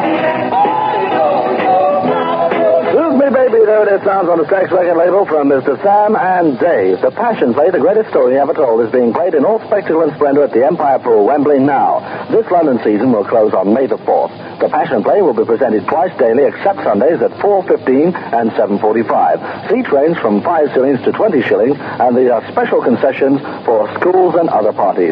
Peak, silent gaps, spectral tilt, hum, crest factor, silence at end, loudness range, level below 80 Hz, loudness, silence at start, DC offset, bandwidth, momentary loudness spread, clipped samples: 0 dBFS; none; -5.5 dB/octave; none; 10 dB; 0 s; 2 LU; -60 dBFS; -12 LUFS; 0 s; under 0.1%; 5.2 kHz; 4 LU; under 0.1%